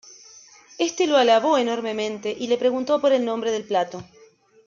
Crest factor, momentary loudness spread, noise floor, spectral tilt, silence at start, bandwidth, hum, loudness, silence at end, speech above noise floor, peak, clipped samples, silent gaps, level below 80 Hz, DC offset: 16 dB; 10 LU; -54 dBFS; -3.5 dB/octave; 0.1 s; 7.6 kHz; none; -22 LUFS; 0.65 s; 32 dB; -6 dBFS; under 0.1%; none; -70 dBFS; under 0.1%